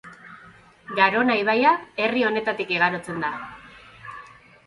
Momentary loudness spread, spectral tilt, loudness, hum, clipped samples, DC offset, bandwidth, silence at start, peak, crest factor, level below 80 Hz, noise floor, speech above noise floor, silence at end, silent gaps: 22 LU; -5.5 dB/octave; -22 LUFS; none; under 0.1%; under 0.1%; 11.5 kHz; 0.05 s; -4 dBFS; 20 dB; -62 dBFS; -50 dBFS; 28 dB; 0.4 s; none